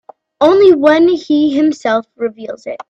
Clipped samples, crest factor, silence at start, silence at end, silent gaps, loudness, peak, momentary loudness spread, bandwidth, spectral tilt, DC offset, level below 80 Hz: under 0.1%; 12 dB; 0.4 s; 0.05 s; none; -11 LUFS; 0 dBFS; 14 LU; 7.8 kHz; -5.5 dB/octave; under 0.1%; -56 dBFS